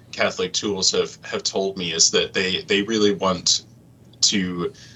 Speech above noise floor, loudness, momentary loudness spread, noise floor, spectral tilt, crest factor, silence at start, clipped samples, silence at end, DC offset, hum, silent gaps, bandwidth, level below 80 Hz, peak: 27 dB; -20 LUFS; 8 LU; -49 dBFS; -2 dB/octave; 20 dB; 0.15 s; under 0.1%; 0 s; under 0.1%; none; none; 8.8 kHz; -58 dBFS; -2 dBFS